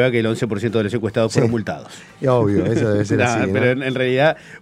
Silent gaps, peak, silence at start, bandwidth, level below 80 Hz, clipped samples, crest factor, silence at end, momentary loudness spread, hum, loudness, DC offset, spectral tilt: none; 0 dBFS; 0 s; 12.5 kHz; -52 dBFS; under 0.1%; 18 dB; 0.05 s; 7 LU; none; -18 LUFS; under 0.1%; -6.5 dB/octave